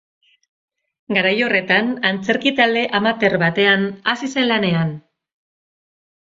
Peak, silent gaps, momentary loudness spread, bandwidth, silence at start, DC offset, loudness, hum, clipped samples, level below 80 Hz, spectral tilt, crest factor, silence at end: -2 dBFS; none; 6 LU; 7.8 kHz; 1.1 s; under 0.1%; -17 LUFS; none; under 0.1%; -62 dBFS; -5.5 dB/octave; 18 dB; 1.2 s